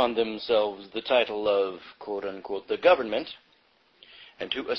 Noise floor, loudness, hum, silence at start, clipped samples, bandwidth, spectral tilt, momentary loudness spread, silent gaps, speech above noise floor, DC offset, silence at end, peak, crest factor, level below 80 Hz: -64 dBFS; -27 LUFS; none; 0 s; under 0.1%; 6 kHz; -6 dB/octave; 15 LU; none; 37 dB; under 0.1%; 0 s; -8 dBFS; 20 dB; -64 dBFS